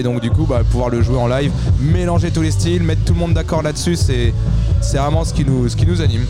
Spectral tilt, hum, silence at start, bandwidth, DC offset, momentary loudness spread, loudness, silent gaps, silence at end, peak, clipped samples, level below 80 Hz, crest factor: -6.5 dB/octave; none; 0 s; 12.5 kHz; 0.9%; 2 LU; -16 LUFS; none; 0 s; -4 dBFS; under 0.1%; -22 dBFS; 10 dB